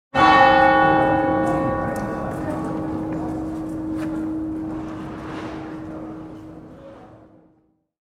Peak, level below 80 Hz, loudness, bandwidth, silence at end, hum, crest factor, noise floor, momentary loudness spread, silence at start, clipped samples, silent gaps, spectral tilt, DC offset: 0 dBFS; -44 dBFS; -20 LUFS; 12.5 kHz; 0.9 s; none; 20 dB; -62 dBFS; 21 LU; 0.15 s; under 0.1%; none; -6.5 dB/octave; under 0.1%